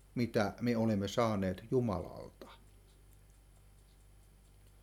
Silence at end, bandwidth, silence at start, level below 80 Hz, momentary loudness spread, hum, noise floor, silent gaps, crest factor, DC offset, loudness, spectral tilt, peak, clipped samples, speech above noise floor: 2.25 s; 16 kHz; 0.15 s; -60 dBFS; 19 LU; none; -61 dBFS; none; 20 dB; under 0.1%; -35 LUFS; -7 dB/octave; -16 dBFS; under 0.1%; 27 dB